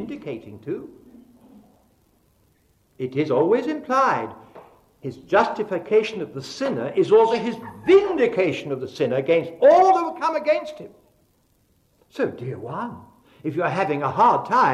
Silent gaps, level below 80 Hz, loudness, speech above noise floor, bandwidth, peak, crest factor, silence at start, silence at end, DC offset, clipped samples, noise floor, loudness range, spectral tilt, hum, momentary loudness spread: none; -64 dBFS; -21 LUFS; 42 dB; 10.5 kHz; -4 dBFS; 18 dB; 0 s; 0 s; under 0.1%; under 0.1%; -63 dBFS; 10 LU; -6.5 dB/octave; none; 17 LU